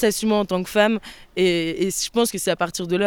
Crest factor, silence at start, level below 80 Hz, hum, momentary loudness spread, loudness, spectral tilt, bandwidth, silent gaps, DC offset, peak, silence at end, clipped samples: 16 dB; 0 s; -50 dBFS; none; 4 LU; -21 LUFS; -4 dB/octave; 19.5 kHz; none; under 0.1%; -4 dBFS; 0 s; under 0.1%